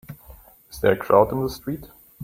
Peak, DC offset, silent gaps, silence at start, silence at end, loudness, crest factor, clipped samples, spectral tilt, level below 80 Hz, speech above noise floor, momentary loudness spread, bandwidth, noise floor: -2 dBFS; under 0.1%; none; 0.1 s; 0 s; -21 LUFS; 22 dB; under 0.1%; -6.5 dB/octave; -48 dBFS; 27 dB; 24 LU; 16.5 kHz; -48 dBFS